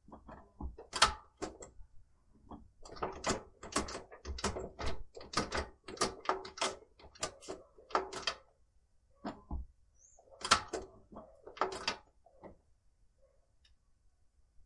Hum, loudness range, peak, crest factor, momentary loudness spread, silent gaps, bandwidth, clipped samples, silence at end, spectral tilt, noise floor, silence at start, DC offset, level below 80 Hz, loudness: none; 6 LU; -12 dBFS; 30 dB; 24 LU; none; 11.5 kHz; under 0.1%; 0.05 s; -2.5 dB/octave; -69 dBFS; 0.1 s; under 0.1%; -54 dBFS; -38 LUFS